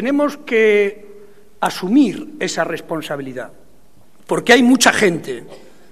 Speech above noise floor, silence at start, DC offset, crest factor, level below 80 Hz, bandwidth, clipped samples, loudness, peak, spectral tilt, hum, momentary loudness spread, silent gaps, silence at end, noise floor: 36 dB; 0 s; 1%; 18 dB; -58 dBFS; 14 kHz; under 0.1%; -16 LUFS; 0 dBFS; -3.5 dB/octave; none; 17 LU; none; 0.35 s; -52 dBFS